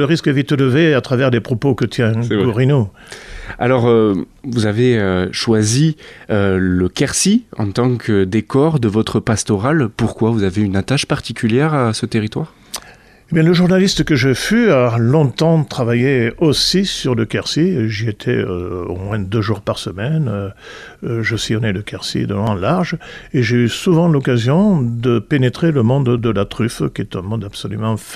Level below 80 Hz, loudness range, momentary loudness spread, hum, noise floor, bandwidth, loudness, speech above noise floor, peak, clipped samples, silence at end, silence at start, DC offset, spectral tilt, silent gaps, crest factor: -42 dBFS; 5 LU; 10 LU; none; -43 dBFS; 14.5 kHz; -16 LUFS; 28 dB; -2 dBFS; under 0.1%; 0 s; 0 s; under 0.1%; -6 dB/octave; none; 14 dB